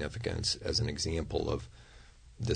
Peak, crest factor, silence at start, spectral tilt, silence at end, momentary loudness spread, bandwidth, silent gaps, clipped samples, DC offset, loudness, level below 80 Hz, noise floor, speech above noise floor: -18 dBFS; 18 dB; 0 s; -4.5 dB/octave; 0 s; 8 LU; 9.6 kHz; none; under 0.1%; under 0.1%; -34 LUFS; -46 dBFS; -55 dBFS; 21 dB